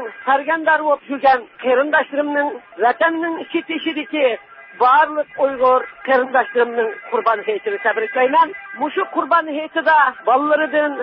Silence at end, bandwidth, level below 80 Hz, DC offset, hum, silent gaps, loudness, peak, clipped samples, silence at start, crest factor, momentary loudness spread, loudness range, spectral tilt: 0 s; 5.6 kHz; -66 dBFS; under 0.1%; none; none; -17 LUFS; -2 dBFS; under 0.1%; 0 s; 14 dB; 8 LU; 2 LU; -8 dB/octave